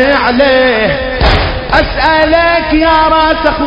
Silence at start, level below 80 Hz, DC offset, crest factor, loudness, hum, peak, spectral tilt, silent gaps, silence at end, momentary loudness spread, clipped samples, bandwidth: 0 s; -20 dBFS; under 0.1%; 8 dB; -9 LUFS; none; 0 dBFS; -7 dB/octave; none; 0 s; 4 LU; 0.4%; 8 kHz